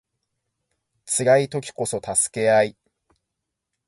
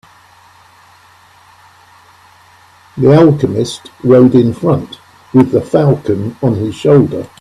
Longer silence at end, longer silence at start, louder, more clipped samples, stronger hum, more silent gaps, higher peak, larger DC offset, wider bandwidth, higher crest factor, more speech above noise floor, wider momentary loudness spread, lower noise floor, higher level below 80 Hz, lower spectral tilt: first, 1.15 s vs 0.15 s; second, 1.05 s vs 2.95 s; second, -21 LUFS vs -11 LUFS; neither; neither; neither; second, -4 dBFS vs 0 dBFS; neither; about the same, 11.5 kHz vs 12 kHz; first, 20 dB vs 12 dB; first, 61 dB vs 34 dB; about the same, 9 LU vs 11 LU; first, -81 dBFS vs -44 dBFS; second, -62 dBFS vs -46 dBFS; second, -3.5 dB/octave vs -8 dB/octave